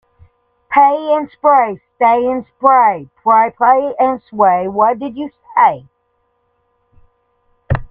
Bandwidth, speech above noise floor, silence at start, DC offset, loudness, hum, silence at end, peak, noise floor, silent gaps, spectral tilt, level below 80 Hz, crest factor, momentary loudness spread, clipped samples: 4.1 kHz; 51 dB; 0.7 s; under 0.1%; -13 LUFS; none; 0.05 s; 0 dBFS; -64 dBFS; none; -9 dB/octave; -42 dBFS; 14 dB; 10 LU; under 0.1%